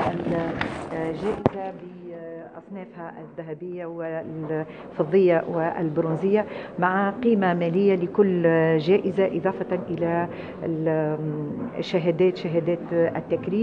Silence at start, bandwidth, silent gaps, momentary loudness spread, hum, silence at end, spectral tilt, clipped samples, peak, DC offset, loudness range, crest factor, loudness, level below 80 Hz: 0 s; 8.8 kHz; none; 17 LU; none; 0 s; -8.5 dB/octave; under 0.1%; -4 dBFS; under 0.1%; 10 LU; 20 dB; -24 LUFS; -58 dBFS